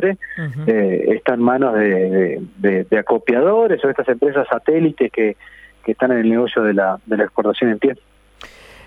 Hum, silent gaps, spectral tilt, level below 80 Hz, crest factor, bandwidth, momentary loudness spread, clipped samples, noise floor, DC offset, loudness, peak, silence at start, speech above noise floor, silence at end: none; none; -8.5 dB/octave; -56 dBFS; 16 dB; 5.2 kHz; 6 LU; under 0.1%; -42 dBFS; under 0.1%; -17 LUFS; -2 dBFS; 0 s; 26 dB; 0.4 s